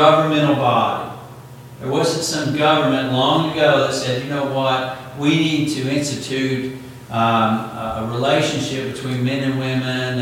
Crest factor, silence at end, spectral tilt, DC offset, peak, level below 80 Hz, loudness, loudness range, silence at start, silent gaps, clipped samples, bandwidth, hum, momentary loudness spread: 18 dB; 0 s; -5 dB/octave; under 0.1%; 0 dBFS; -54 dBFS; -19 LUFS; 3 LU; 0 s; none; under 0.1%; 17 kHz; none; 11 LU